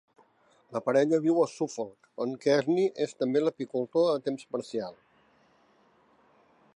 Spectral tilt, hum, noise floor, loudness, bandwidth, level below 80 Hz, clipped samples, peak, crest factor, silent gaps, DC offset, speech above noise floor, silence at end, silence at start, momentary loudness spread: -6 dB/octave; none; -65 dBFS; -29 LUFS; 11 kHz; -82 dBFS; under 0.1%; -12 dBFS; 18 dB; none; under 0.1%; 37 dB; 1.85 s; 0.7 s; 11 LU